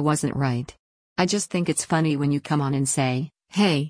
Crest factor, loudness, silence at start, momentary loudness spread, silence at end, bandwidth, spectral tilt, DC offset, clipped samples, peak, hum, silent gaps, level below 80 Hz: 16 dB; -24 LUFS; 0 s; 8 LU; 0 s; 10.5 kHz; -5 dB/octave; under 0.1%; under 0.1%; -8 dBFS; none; 0.79-1.16 s; -56 dBFS